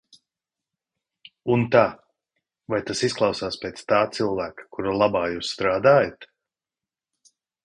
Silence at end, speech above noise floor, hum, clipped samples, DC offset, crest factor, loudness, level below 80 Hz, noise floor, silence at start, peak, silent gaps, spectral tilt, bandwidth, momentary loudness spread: 1.4 s; over 68 dB; none; under 0.1%; under 0.1%; 20 dB; -23 LUFS; -56 dBFS; under -90 dBFS; 1.45 s; -4 dBFS; none; -5 dB/octave; 10.5 kHz; 12 LU